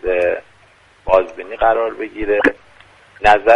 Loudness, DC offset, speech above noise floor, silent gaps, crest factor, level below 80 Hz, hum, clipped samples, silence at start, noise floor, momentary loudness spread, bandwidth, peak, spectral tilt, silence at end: -17 LUFS; under 0.1%; 36 dB; none; 16 dB; -38 dBFS; none; under 0.1%; 0.05 s; -50 dBFS; 12 LU; 10.5 kHz; 0 dBFS; -5 dB/octave; 0 s